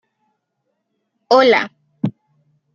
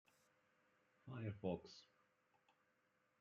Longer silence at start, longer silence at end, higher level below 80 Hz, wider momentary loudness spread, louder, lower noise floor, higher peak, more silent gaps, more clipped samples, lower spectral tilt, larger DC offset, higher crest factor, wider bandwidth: first, 1.3 s vs 1.05 s; second, 0.65 s vs 1.35 s; first, -68 dBFS vs -86 dBFS; second, 14 LU vs 17 LU; first, -16 LUFS vs -50 LUFS; second, -73 dBFS vs -83 dBFS; first, -2 dBFS vs -32 dBFS; neither; neither; second, -5.5 dB/octave vs -7.5 dB/octave; neither; second, 18 dB vs 24 dB; second, 7.2 kHz vs 8.4 kHz